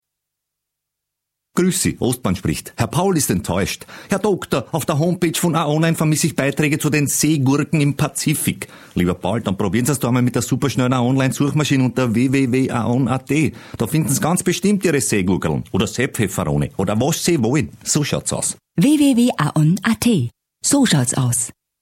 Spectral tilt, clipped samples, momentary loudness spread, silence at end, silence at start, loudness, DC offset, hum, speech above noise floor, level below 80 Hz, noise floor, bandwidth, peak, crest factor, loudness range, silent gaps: -5 dB/octave; under 0.1%; 5 LU; 0.3 s; 1.55 s; -18 LUFS; under 0.1%; none; 63 dB; -46 dBFS; -81 dBFS; 16.5 kHz; -2 dBFS; 16 dB; 3 LU; none